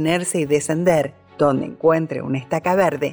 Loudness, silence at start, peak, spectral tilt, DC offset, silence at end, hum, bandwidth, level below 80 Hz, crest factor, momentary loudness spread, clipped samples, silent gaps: -20 LUFS; 0 s; -6 dBFS; -5.5 dB/octave; under 0.1%; 0 s; none; over 20 kHz; -56 dBFS; 14 dB; 6 LU; under 0.1%; none